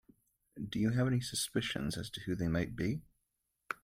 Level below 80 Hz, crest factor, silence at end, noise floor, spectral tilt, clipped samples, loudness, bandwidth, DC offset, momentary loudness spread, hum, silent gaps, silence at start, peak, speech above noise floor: -58 dBFS; 18 dB; 0.1 s; -84 dBFS; -5 dB/octave; under 0.1%; -36 LUFS; 16 kHz; under 0.1%; 10 LU; none; none; 0.55 s; -18 dBFS; 49 dB